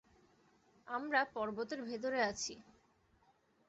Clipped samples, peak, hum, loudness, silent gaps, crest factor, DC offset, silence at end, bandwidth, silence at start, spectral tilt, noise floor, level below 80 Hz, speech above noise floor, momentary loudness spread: under 0.1%; -18 dBFS; none; -38 LUFS; none; 24 dB; under 0.1%; 1.05 s; 8 kHz; 0.85 s; -1.5 dB/octave; -73 dBFS; -74 dBFS; 35 dB; 9 LU